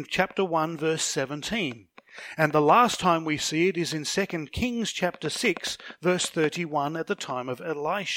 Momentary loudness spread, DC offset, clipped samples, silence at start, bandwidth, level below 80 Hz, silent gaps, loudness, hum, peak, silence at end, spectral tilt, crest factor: 10 LU; under 0.1%; under 0.1%; 0 s; 17 kHz; -56 dBFS; none; -26 LUFS; none; -6 dBFS; 0 s; -4 dB/octave; 22 dB